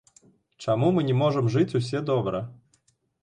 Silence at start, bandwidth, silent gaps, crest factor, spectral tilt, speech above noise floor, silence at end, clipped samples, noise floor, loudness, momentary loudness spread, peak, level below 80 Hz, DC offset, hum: 0.6 s; 10 kHz; none; 16 dB; -7.5 dB/octave; 44 dB; 0.7 s; under 0.1%; -68 dBFS; -25 LUFS; 11 LU; -10 dBFS; -60 dBFS; under 0.1%; none